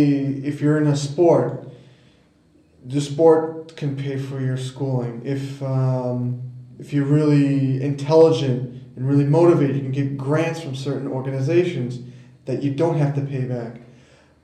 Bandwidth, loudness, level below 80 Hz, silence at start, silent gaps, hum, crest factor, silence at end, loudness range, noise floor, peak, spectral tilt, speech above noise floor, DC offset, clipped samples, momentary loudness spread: 9.4 kHz; -21 LUFS; -62 dBFS; 0 s; none; none; 16 dB; 0.6 s; 6 LU; -56 dBFS; -4 dBFS; -8 dB/octave; 36 dB; under 0.1%; under 0.1%; 13 LU